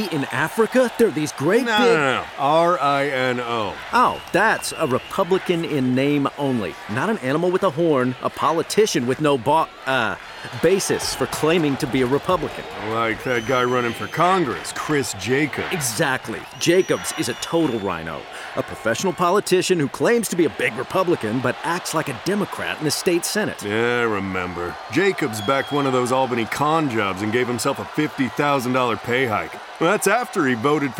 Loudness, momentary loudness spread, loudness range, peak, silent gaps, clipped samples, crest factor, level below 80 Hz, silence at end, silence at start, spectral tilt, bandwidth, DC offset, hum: -21 LUFS; 6 LU; 3 LU; -6 dBFS; none; under 0.1%; 14 dB; -54 dBFS; 0 s; 0 s; -4.5 dB/octave; 17 kHz; under 0.1%; none